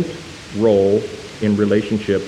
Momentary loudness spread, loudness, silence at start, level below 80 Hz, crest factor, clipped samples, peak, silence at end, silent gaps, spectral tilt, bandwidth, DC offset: 15 LU; -17 LUFS; 0 s; -50 dBFS; 14 dB; under 0.1%; -4 dBFS; 0 s; none; -7 dB/octave; 11.5 kHz; under 0.1%